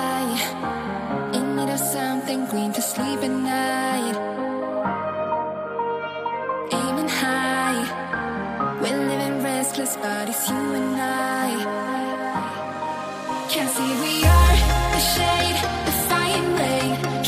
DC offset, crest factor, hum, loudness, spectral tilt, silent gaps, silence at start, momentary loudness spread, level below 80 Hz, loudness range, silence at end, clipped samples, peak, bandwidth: under 0.1%; 18 dB; none; -23 LUFS; -4 dB/octave; none; 0 s; 8 LU; -30 dBFS; 6 LU; 0 s; under 0.1%; -4 dBFS; 15.5 kHz